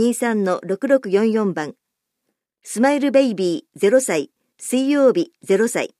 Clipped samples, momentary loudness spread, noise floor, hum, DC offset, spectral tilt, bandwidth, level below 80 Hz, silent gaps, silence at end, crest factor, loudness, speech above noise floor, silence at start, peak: under 0.1%; 9 LU; -76 dBFS; none; under 0.1%; -5 dB/octave; 14.5 kHz; -74 dBFS; none; 0.15 s; 16 dB; -19 LUFS; 58 dB; 0 s; -4 dBFS